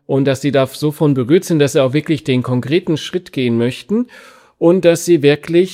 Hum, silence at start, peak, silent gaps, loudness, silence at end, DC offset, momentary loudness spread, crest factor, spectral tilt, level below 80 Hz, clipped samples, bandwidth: none; 0.1 s; 0 dBFS; none; -15 LUFS; 0 s; under 0.1%; 7 LU; 14 dB; -6 dB/octave; -58 dBFS; under 0.1%; 16 kHz